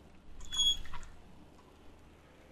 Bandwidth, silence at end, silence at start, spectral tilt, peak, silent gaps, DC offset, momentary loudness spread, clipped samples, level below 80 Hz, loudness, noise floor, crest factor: 14 kHz; 0.05 s; 0 s; 0 dB/octave; -20 dBFS; none; under 0.1%; 26 LU; under 0.1%; -50 dBFS; -31 LUFS; -58 dBFS; 18 dB